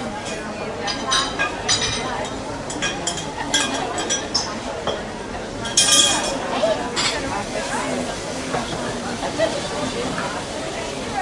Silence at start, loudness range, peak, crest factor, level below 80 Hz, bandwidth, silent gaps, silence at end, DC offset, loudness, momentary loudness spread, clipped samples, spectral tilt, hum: 0 s; 5 LU; -2 dBFS; 22 dB; -44 dBFS; 12 kHz; none; 0 s; under 0.1%; -21 LUFS; 10 LU; under 0.1%; -2 dB/octave; none